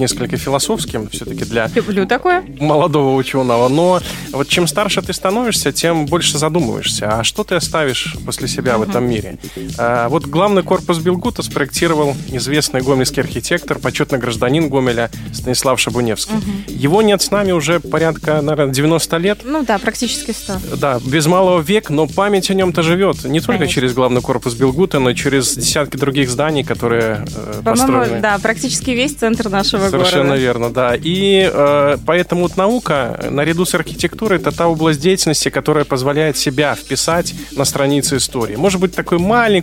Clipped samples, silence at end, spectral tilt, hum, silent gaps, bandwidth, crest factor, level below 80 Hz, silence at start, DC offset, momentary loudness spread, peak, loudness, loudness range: under 0.1%; 0 s; -4.5 dB/octave; none; none; 16.5 kHz; 14 dB; -38 dBFS; 0 s; under 0.1%; 6 LU; 0 dBFS; -15 LUFS; 2 LU